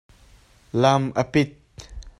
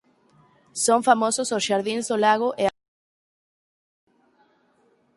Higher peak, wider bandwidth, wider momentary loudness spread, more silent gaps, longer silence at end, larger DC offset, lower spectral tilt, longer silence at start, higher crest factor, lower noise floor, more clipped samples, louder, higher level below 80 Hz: about the same, -4 dBFS vs -2 dBFS; about the same, 12 kHz vs 11.5 kHz; first, 20 LU vs 7 LU; neither; second, 0.1 s vs 2.45 s; neither; first, -6 dB/octave vs -2.5 dB/octave; about the same, 0.75 s vs 0.75 s; about the same, 20 dB vs 22 dB; second, -53 dBFS vs -63 dBFS; neither; about the same, -22 LUFS vs -22 LUFS; first, -46 dBFS vs -68 dBFS